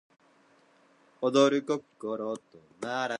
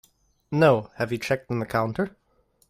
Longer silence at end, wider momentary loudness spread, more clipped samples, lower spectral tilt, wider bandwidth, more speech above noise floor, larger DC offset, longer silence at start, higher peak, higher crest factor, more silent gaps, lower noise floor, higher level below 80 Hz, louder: second, 0 s vs 0.6 s; first, 14 LU vs 11 LU; neither; second, -4.5 dB/octave vs -7 dB/octave; second, 11 kHz vs 16 kHz; second, 34 dB vs 42 dB; neither; first, 1.2 s vs 0.5 s; second, -10 dBFS vs -6 dBFS; about the same, 22 dB vs 20 dB; neither; about the same, -63 dBFS vs -66 dBFS; second, -84 dBFS vs -58 dBFS; second, -29 LUFS vs -25 LUFS